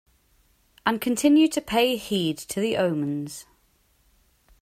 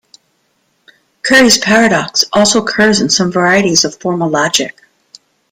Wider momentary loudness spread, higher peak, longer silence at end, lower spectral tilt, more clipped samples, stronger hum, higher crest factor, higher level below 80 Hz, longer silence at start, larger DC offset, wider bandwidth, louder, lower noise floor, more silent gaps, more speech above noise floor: first, 11 LU vs 8 LU; second, -6 dBFS vs 0 dBFS; first, 1.2 s vs 0.8 s; first, -4.5 dB/octave vs -3 dB/octave; neither; neither; first, 18 dB vs 12 dB; second, -58 dBFS vs -48 dBFS; second, 0.85 s vs 1.25 s; neither; about the same, 16 kHz vs 17 kHz; second, -23 LUFS vs -10 LUFS; first, -64 dBFS vs -60 dBFS; neither; second, 41 dB vs 49 dB